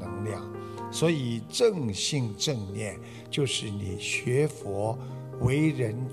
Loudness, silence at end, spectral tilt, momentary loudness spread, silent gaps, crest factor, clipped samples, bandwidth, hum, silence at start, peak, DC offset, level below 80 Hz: -29 LUFS; 0 s; -5 dB/octave; 11 LU; none; 18 dB; under 0.1%; 14 kHz; none; 0 s; -12 dBFS; under 0.1%; -56 dBFS